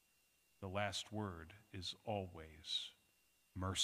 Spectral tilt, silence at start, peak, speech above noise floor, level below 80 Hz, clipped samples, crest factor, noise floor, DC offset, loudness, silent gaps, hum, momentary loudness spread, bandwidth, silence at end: -3.5 dB/octave; 0.6 s; -24 dBFS; 32 dB; -74 dBFS; under 0.1%; 24 dB; -77 dBFS; under 0.1%; -46 LUFS; none; none; 12 LU; 15.5 kHz; 0 s